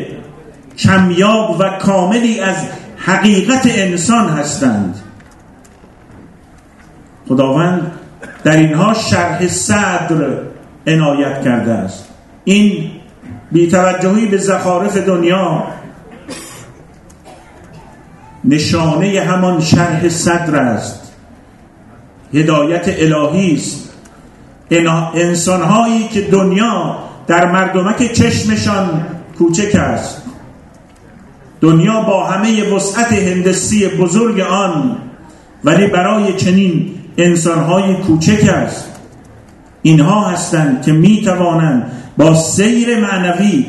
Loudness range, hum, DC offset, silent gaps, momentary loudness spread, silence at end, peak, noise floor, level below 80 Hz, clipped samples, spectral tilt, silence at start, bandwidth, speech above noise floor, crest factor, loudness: 5 LU; none; under 0.1%; none; 12 LU; 0 s; 0 dBFS; -41 dBFS; -44 dBFS; under 0.1%; -5.5 dB/octave; 0 s; 12.5 kHz; 30 dB; 12 dB; -12 LUFS